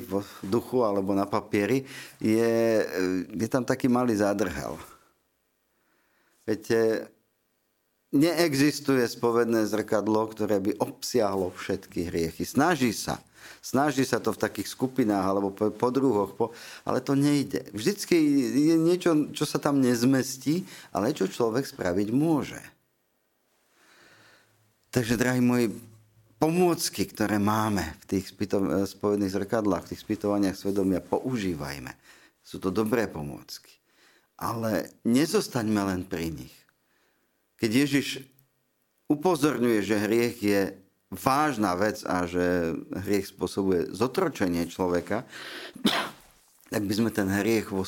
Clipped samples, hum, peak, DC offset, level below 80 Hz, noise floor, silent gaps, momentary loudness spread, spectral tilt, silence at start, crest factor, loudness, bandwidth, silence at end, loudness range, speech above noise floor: under 0.1%; none; -4 dBFS; under 0.1%; -58 dBFS; -73 dBFS; none; 10 LU; -5.5 dB/octave; 0 s; 24 dB; -27 LUFS; 17 kHz; 0 s; 5 LU; 47 dB